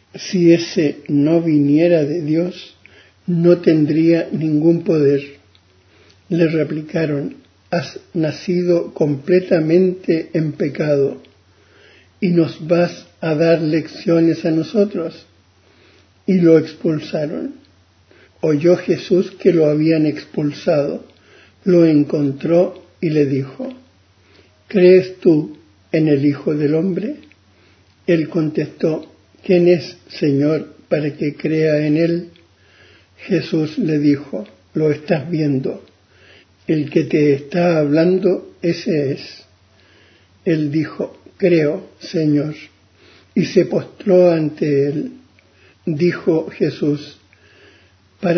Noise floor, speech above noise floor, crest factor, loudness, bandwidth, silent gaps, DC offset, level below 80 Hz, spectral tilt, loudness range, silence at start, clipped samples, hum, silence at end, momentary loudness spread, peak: -52 dBFS; 36 dB; 18 dB; -17 LUFS; 6.4 kHz; none; under 0.1%; -60 dBFS; -8 dB/octave; 4 LU; 0.15 s; under 0.1%; none; 0 s; 12 LU; 0 dBFS